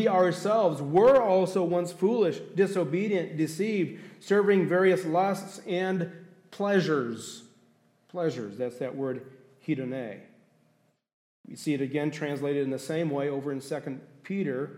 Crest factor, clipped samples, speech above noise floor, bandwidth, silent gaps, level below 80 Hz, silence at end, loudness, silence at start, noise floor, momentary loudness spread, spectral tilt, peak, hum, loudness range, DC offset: 16 dB; under 0.1%; 42 dB; 15 kHz; 11.13-11.44 s; -72 dBFS; 0 s; -27 LUFS; 0 s; -69 dBFS; 14 LU; -6.5 dB/octave; -12 dBFS; none; 10 LU; under 0.1%